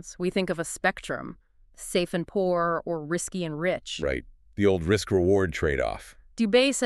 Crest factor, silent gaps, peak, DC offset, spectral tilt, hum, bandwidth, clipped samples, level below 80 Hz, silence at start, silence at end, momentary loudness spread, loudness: 18 dB; none; -8 dBFS; under 0.1%; -4.5 dB/octave; none; 13.5 kHz; under 0.1%; -46 dBFS; 0.05 s; 0 s; 12 LU; -27 LUFS